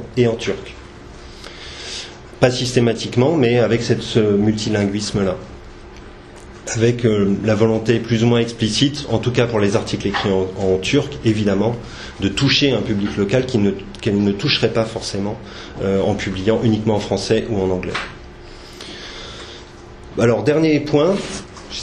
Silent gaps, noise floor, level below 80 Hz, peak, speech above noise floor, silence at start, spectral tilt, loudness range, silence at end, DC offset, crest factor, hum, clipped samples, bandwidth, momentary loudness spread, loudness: none; -38 dBFS; -40 dBFS; 0 dBFS; 20 dB; 0 s; -5.5 dB/octave; 4 LU; 0 s; under 0.1%; 18 dB; none; under 0.1%; 11 kHz; 20 LU; -18 LUFS